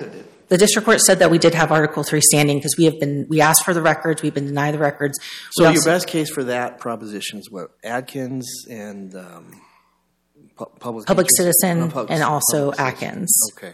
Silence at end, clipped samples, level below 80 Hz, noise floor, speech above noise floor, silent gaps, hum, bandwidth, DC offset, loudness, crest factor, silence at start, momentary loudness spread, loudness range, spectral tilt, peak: 0 s; under 0.1%; -56 dBFS; -65 dBFS; 47 dB; none; none; 17 kHz; under 0.1%; -17 LUFS; 18 dB; 0 s; 19 LU; 16 LU; -3.5 dB/octave; 0 dBFS